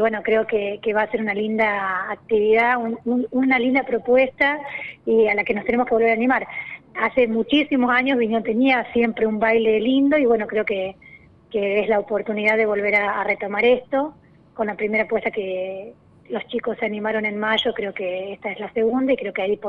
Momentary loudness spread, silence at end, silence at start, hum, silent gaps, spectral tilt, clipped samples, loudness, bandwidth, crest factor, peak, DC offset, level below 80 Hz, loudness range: 10 LU; 0 s; 0 s; none; none; -7 dB/octave; under 0.1%; -20 LUFS; 6.6 kHz; 14 dB; -6 dBFS; under 0.1%; -56 dBFS; 5 LU